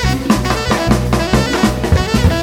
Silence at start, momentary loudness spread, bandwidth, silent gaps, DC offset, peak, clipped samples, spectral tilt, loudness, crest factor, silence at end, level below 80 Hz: 0 s; 2 LU; 17 kHz; none; under 0.1%; 0 dBFS; under 0.1%; -5.5 dB/octave; -14 LUFS; 12 dB; 0 s; -22 dBFS